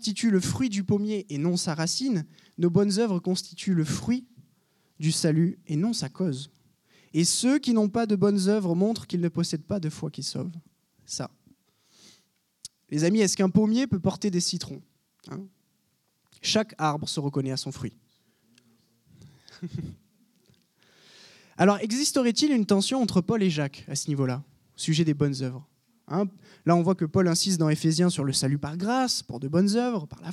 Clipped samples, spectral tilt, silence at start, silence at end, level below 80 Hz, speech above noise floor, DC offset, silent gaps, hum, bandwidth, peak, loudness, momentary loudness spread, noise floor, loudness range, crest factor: under 0.1%; -5 dB/octave; 0 s; 0 s; -62 dBFS; 46 dB; under 0.1%; none; none; 14 kHz; -8 dBFS; -26 LUFS; 14 LU; -72 dBFS; 8 LU; 20 dB